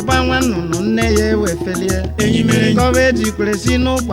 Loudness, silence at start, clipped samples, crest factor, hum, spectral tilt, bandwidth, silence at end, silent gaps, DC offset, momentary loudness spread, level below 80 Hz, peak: -15 LUFS; 0 s; under 0.1%; 14 dB; none; -5 dB/octave; 16.5 kHz; 0 s; none; under 0.1%; 6 LU; -28 dBFS; 0 dBFS